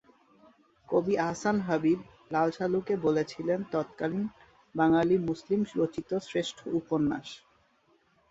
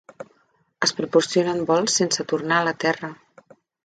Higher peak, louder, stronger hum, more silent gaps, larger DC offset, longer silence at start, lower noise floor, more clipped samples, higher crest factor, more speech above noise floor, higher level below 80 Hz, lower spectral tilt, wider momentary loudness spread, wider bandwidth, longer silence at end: second, -12 dBFS vs -4 dBFS; second, -30 LUFS vs -21 LUFS; neither; neither; neither; first, 0.9 s vs 0.2 s; first, -68 dBFS vs -64 dBFS; neither; about the same, 18 dB vs 20 dB; second, 39 dB vs 43 dB; about the same, -64 dBFS vs -68 dBFS; first, -6.5 dB/octave vs -3 dB/octave; second, 8 LU vs 12 LU; second, 8 kHz vs 9.4 kHz; first, 0.95 s vs 0.7 s